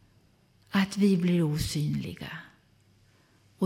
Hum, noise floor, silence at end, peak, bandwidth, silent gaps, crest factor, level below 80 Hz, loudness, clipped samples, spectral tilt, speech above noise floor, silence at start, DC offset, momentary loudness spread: none; -63 dBFS; 0 s; -14 dBFS; 16 kHz; none; 16 dB; -52 dBFS; -28 LUFS; under 0.1%; -6 dB/octave; 36 dB; 0.7 s; under 0.1%; 16 LU